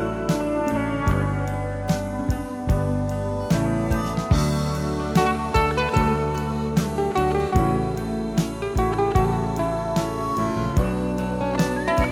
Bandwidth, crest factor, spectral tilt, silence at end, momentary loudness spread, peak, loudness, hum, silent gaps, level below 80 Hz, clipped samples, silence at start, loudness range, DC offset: 16.5 kHz; 16 dB; -6.5 dB/octave; 0 s; 5 LU; -6 dBFS; -23 LUFS; none; none; -32 dBFS; under 0.1%; 0 s; 2 LU; under 0.1%